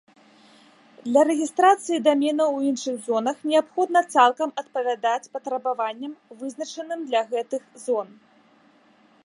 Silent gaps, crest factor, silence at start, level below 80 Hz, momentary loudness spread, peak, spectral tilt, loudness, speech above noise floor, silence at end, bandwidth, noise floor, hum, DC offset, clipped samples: none; 20 dB; 1.05 s; -84 dBFS; 14 LU; -4 dBFS; -3 dB/octave; -23 LUFS; 35 dB; 1.2 s; 11.5 kHz; -57 dBFS; none; under 0.1%; under 0.1%